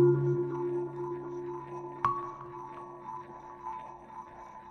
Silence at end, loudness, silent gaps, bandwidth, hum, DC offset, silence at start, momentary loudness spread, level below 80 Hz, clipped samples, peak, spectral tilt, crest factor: 0 s; -35 LUFS; none; 6.4 kHz; none; under 0.1%; 0 s; 16 LU; -66 dBFS; under 0.1%; -14 dBFS; -10 dB/octave; 20 dB